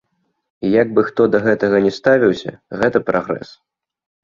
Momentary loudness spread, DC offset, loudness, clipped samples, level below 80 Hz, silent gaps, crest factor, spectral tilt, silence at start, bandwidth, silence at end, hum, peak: 11 LU; under 0.1%; -16 LUFS; under 0.1%; -54 dBFS; none; 16 dB; -7 dB/octave; 0.6 s; 7.4 kHz; 0.8 s; none; 0 dBFS